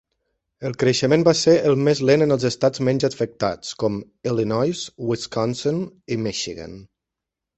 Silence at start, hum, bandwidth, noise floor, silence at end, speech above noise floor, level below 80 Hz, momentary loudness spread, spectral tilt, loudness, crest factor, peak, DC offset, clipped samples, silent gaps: 0.6 s; none; 8.4 kHz; -85 dBFS; 0.7 s; 64 dB; -56 dBFS; 12 LU; -5.5 dB/octave; -21 LUFS; 18 dB; -2 dBFS; under 0.1%; under 0.1%; none